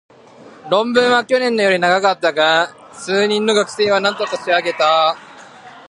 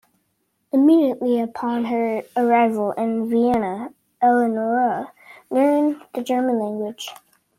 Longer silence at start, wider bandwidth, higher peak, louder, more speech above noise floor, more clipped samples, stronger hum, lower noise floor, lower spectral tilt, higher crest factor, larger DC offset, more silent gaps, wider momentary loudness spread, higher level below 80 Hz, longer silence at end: second, 0.45 s vs 0.75 s; second, 11.5 kHz vs 15.5 kHz; first, 0 dBFS vs -6 dBFS; first, -15 LUFS vs -20 LUFS; second, 26 dB vs 51 dB; neither; neither; second, -42 dBFS vs -70 dBFS; second, -3.5 dB/octave vs -6 dB/octave; about the same, 16 dB vs 14 dB; neither; neither; second, 6 LU vs 12 LU; second, -68 dBFS vs -60 dBFS; second, 0.05 s vs 0.45 s